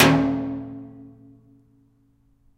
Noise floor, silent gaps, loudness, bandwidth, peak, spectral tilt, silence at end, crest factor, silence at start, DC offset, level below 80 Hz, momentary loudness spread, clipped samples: -61 dBFS; none; -23 LUFS; 16 kHz; 0 dBFS; -5 dB/octave; 1.55 s; 24 dB; 0 s; under 0.1%; -50 dBFS; 27 LU; under 0.1%